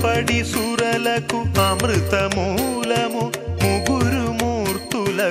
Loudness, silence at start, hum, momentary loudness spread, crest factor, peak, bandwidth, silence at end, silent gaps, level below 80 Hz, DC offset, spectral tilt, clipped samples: -20 LUFS; 0 s; none; 4 LU; 18 dB; -2 dBFS; 16 kHz; 0 s; none; -38 dBFS; under 0.1%; -4.5 dB/octave; under 0.1%